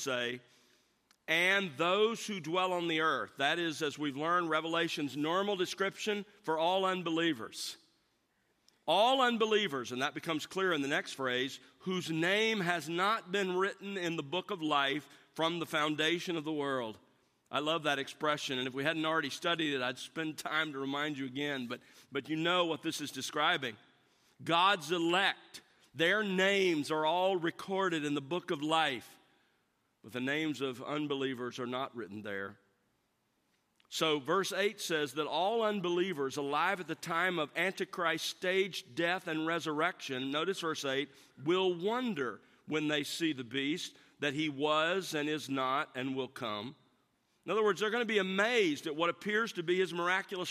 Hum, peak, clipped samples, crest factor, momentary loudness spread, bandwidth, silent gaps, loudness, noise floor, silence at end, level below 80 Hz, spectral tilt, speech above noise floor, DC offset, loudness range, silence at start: none; -14 dBFS; under 0.1%; 20 dB; 10 LU; 15 kHz; none; -33 LUFS; -78 dBFS; 0 s; -86 dBFS; -4 dB/octave; 44 dB; under 0.1%; 4 LU; 0 s